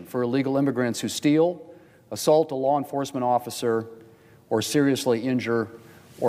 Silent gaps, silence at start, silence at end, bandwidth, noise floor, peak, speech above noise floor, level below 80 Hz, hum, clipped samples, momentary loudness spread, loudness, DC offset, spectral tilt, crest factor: none; 0 s; 0 s; 16 kHz; -52 dBFS; -8 dBFS; 28 dB; -68 dBFS; none; under 0.1%; 8 LU; -24 LUFS; under 0.1%; -5 dB/octave; 18 dB